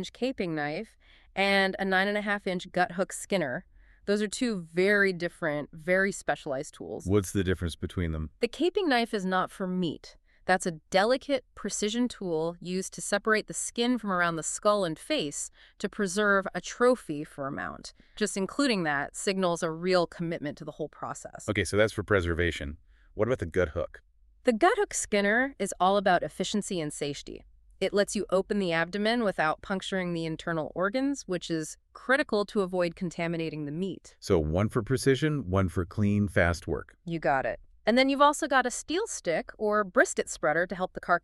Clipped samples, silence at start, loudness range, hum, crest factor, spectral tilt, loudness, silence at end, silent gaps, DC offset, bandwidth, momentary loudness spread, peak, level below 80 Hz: under 0.1%; 0 s; 3 LU; none; 22 dB; -4.5 dB/octave; -29 LUFS; 0.05 s; none; under 0.1%; 13.5 kHz; 11 LU; -8 dBFS; -50 dBFS